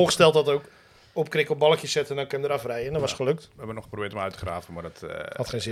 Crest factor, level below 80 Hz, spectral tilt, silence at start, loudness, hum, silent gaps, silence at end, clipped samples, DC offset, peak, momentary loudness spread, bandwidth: 22 dB; -54 dBFS; -4 dB/octave; 0 s; -26 LUFS; none; none; 0 s; under 0.1%; under 0.1%; -4 dBFS; 16 LU; 15 kHz